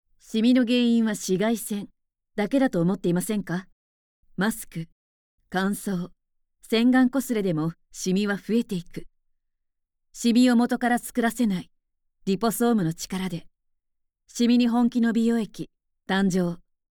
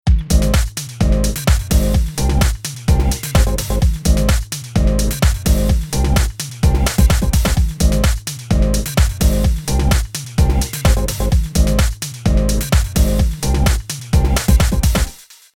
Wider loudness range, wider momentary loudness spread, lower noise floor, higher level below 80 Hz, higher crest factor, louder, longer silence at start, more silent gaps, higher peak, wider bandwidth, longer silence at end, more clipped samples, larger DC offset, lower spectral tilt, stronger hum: first, 5 LU vs 1 LU; first, 15 LU vs 4 LU; first, -78 dBFS vs -34 dBFS; second, -56 dBFS vs -16 dBFS; about the same, 16 dB vs 14 dB; second, -24 LUFS vs -17 LUFS; first, 0.3 s vs 0.05 s; first, 3.72-4.23 s, 4.92-5.38 s vs none; second, -8 dBFS vs 0 dBFS; first, 19.5 kHz vs 17.5 kHz; about the same, 0.4 s vs 0.4 s; neither; neither; about the same, -5.5 dB/octave vs -5 dB/octave; neither